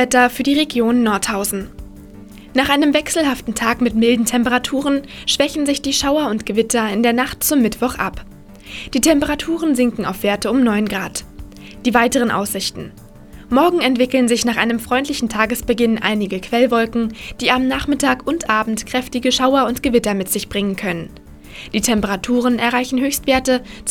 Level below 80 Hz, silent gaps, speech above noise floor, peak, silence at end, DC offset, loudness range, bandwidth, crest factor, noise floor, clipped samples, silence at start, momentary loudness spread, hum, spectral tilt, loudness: -40 dBFS; none; 21 dB; 0 dBFS; 0 s; under 0.1%; 2 LU; 18.5 kHz; 16 dB; -38 dBFS; under 0.1%; 0 s; 8 LU; none; -3.5 dB/octave; -17 LUFS